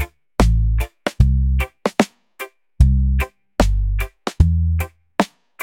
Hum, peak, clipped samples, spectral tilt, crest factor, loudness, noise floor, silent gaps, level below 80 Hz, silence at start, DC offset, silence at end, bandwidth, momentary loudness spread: none; 0 dBFS; under 0.1%; -6.5 dB/octave; 18 dB; -20 LUFS; -37 dBFS; none; -20 dBFS; 0 s; under 0.1%; 0 s; 16.5 kHz; 9 LU